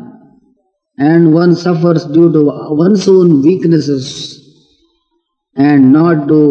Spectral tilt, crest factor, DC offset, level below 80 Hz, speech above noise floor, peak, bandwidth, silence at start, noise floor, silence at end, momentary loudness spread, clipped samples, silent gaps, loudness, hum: -7.5 dB/octave; 10 dB; under 0.1%; -58 dBFS; 57 dB; 0 dBFS; 8.4 kHz; 0 s; -65 dBFS; 0 s; 10 LU; 0.5%; none; -9 LUFS; none